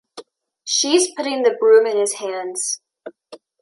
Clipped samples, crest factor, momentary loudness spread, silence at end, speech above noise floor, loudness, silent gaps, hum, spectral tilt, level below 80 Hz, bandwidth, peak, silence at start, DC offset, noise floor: under 0.1%; 16 dB; 13 LU; 0.25 s; 24 dB; -18 LUFS; none; none; -0.5 dB/octave; -78 dBFS; 11.5 kHz; -2 dBFS; 0.15 s; under 0.1%; -42 dBFS